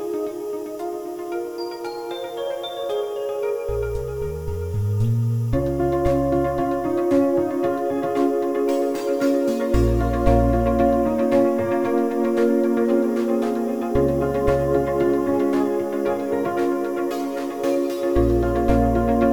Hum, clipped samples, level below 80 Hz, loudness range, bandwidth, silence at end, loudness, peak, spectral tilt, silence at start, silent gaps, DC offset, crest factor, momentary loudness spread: none; under 0.1%; -32 dBFS; 7 LU; 18 kHz; 0 s; -22 LUFS; -4 dBFS; -8 dB/octave; 0 s; none; 0.3%; 16 dB; 9 LU